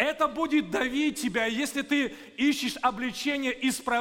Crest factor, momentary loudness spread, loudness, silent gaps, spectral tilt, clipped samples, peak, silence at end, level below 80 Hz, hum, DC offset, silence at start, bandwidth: 18 dB; 3 LU; -27 LUFS; none; -3 dB/octave; under 0.1%; -10 dBFS; 0 s; -58 dBFS; none; under 0.1%; 0 s; 17 kHz